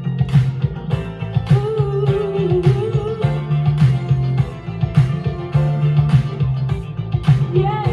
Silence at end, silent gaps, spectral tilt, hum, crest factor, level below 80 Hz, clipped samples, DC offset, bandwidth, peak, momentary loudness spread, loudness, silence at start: 0 s; none; -9 dB/octave; none; 16 dB; -34 dBFS; under 0.1%; under 0.1%; 6.6 kHz; -2 dBFS; 7 LU; -18 LUFS; 0 s